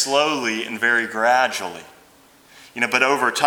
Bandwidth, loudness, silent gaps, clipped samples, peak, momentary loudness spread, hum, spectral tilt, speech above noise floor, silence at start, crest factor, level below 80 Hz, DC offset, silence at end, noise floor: over 20 kHz; -19 LUFS; none; under 0.1%; 0 dBFS; 14 LU; none; -2 dB/octave; 32 dB; 0 s; 20 dB; -70 dBFS; under 0.1%; 0 s; -52 dBFS